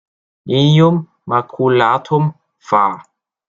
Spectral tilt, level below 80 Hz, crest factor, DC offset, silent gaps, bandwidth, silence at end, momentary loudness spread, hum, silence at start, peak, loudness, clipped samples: -7.5 dB/octave; -56 dBFS; 14 dB; under 0.1%; none; 7.4 kHz; 0.45 s; 9 LU; none; 0.45 s; -2 dBFS; -15 LUFS; under 0.1%